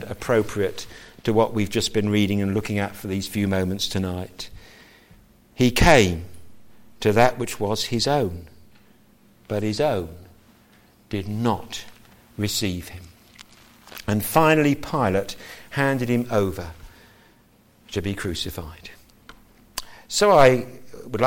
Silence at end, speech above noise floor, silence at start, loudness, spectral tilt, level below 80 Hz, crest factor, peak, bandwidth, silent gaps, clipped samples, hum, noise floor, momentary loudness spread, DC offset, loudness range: 0 s; 35 dB; 0 s; -22 LUFS; -5 dB/octave; -42 dBFS; 20 dB; -4 dBFS; 17 kHz; none; under 0.1%; none; -56 dBFS; 21 LU; under 0.1%; 8 LU